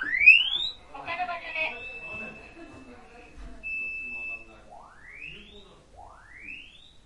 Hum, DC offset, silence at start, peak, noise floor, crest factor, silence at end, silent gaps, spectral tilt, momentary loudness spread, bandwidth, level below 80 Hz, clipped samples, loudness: none; under 0.1%; 0 s; -4 dBFS; -51 dBFS; 26 dB; 0.35 s; none; -2 dB/octave; 28 LU; 11 kHz; -54 dBFS; under 0.1%; -23 LUFS